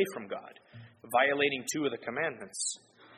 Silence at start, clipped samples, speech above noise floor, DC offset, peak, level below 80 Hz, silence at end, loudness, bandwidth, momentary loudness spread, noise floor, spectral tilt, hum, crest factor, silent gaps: 0 s; under 0.1%; 20 dB; under 0.1%; -12 dBFS; -78 dBFS; 0 s; -31 LUFS; 13.5 kHz; 17 LU; -52 dBFS; -2.5 dB/octave; none; 22 dB; none